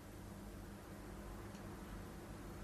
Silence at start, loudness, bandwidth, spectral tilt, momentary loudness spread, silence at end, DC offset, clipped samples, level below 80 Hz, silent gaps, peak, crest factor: 0 s; -53 LUFS; 15.5 kHz; -5.5 dB/octave; 2 LU; 0 s; under 0.1%; under 0.1%; -58 dBFS; none; -38 dBFS; 12 dB